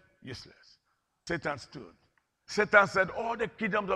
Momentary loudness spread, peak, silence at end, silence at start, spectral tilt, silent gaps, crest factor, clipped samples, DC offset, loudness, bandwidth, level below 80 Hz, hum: 23 LU; -6 dBFS; 0 s; 0.25 s; -4.5 dB/octave; none; 26 dB; under 0.1%; under 0.1%; -28 LUFS; 11 kHz; -62 dBFS; none